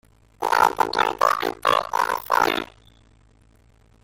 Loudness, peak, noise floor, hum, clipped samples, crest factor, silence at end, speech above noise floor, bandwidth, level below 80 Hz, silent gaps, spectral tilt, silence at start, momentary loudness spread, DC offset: -21 LUFS; -4 dBFS; -56 dBFS; none; under 0.1%; 20 dB; 1.4 s; 34 dB; 17 kHz; -54 dBFS; none; -2.5 dB/octave; 0.4 s; 7 LU; under 0.1%